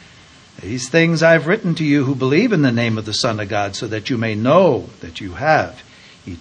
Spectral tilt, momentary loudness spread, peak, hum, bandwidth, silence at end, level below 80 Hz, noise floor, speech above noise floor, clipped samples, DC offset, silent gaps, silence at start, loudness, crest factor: -5.5 dB/octave; 15 LU; 0 dBFS; none; 9.8 kHz; 0 s; -52 dBFS; -45 dBFS; 28 dB; under 0.1%; under 0.1%; none; 0.6 s; -16 LUFS; 18 dB